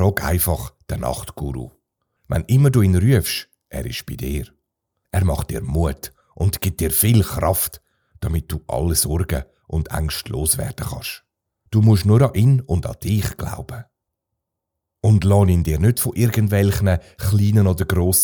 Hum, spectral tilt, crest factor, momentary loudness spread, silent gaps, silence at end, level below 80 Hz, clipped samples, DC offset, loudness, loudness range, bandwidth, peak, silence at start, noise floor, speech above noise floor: none; -5.5 dB/octave; 18 dB; 14 LU; none; 0 s; -36 dBFS; under 0.1%; under 0.1%; -19 LUFS; 4 LU; over 20 kHz; -2 dBFS; 0 s; -81 dBFS; 63 dB